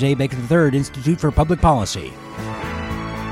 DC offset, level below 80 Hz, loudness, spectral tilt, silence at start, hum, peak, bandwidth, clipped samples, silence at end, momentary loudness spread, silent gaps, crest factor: under 0.1%; -32 dBFS; -20 LUFS; -6.5 dB/octave; 0 s; none; -2 dBFS; 14 kHz; under 0.1%; 0 s; 12 LU; none; 16 dB